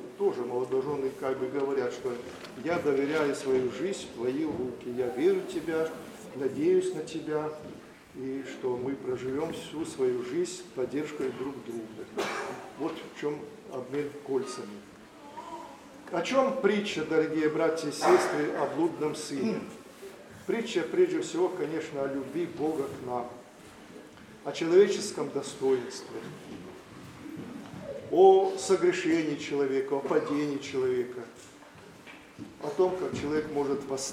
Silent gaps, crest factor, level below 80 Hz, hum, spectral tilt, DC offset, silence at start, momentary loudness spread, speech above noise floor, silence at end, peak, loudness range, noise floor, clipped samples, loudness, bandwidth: none; 22 dB; -68 dBFS; none; -5 dB/octave; under 0.1%; 0 s; 20 LU; 21 dB; 0 s; -8 dBFS; 8 LU; -51 dBFS; under 0.1%; -30 LUFS; 14 kHz